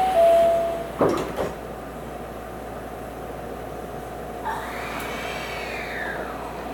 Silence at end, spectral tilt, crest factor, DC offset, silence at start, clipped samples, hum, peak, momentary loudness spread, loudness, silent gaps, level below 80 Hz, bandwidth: 0 s; -5 dB/octave; 20 dB; under 0.1%; 0 s; under 0.1%; none; -6 dBFS; 16 LU; -26 LUFS; none; -44 dBFS; 20 kHz